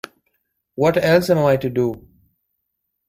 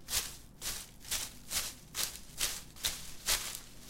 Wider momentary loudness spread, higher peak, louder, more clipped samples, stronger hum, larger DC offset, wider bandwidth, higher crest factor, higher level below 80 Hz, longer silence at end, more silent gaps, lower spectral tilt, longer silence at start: first, 22 LU vs 8 LU; first, -2 dBFS vs -14 dBFS; first, -18 LUFS vs -36 LUFS; neither; neither; neither; about the same, 16 kHz vs 17 kHz; second, 18 dB vs 26 dB; about the same, -52 dBFS vs -52 dBFS; first, 1.1 s vs 0 s; neither; first, -6.5 dB/octave vs 0 dB/octave; first, 0.8 s vs 0 s